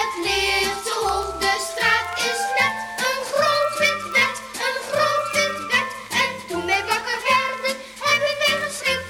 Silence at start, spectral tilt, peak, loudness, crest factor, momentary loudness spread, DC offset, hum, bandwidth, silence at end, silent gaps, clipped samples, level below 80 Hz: 0 s; -1.5 dB/octave; -6 dBFS; -21 LUFS; 16 dB; 5 LU; under 0.1%; none; 19 kHz; 0 s; none; under 0.1%; -50 dBFS